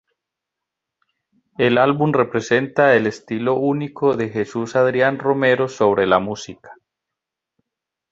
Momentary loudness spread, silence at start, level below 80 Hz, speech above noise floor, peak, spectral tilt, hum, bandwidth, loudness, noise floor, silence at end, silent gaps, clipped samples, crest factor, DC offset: 9 LU; 1.6 s; -58 dBFS; 66 dB; -2 dBFS; -6 dB/octave; none; 7.8 kHz; -18 LUFS; -84 dBFS; 1.4 s; none; under 0.1%; 18 dB; under 0.1%